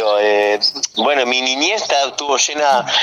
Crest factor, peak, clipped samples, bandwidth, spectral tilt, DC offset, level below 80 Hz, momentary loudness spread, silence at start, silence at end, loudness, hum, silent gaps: 12 dB; -4 dBFS; under 0.1%; 13 kHz; -0.5 dB/octave; under 0.1%; -68 dBFS; 3 LU; 0 s; 0 s; -15 LUFS; none; none